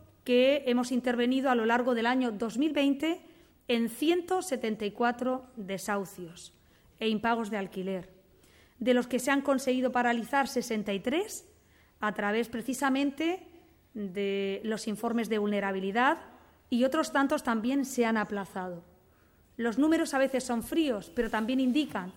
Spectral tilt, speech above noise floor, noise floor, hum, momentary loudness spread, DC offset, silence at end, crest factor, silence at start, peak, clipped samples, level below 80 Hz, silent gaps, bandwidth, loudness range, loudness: -4.5 dB/octave; 34 dB; -63 dBFS; none; 10 LU; under 0.1%; 0.05 s; 18 dB; 0.25 s; -12 dBFS; under 0.1%; -62 dBFS; none; 17 kHz; 4 LU; -30 LUFS